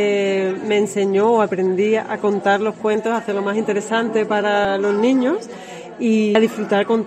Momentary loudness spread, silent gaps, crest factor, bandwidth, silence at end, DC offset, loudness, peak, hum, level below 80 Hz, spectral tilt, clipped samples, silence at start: 5 LU; none; 14 dB; 12.5 kHz; 0 s; under 0.1%; -18 LUFS; -4 dBFS; none; -62 dBFS; -5.5 dB/octave; under 0.1%; 0 s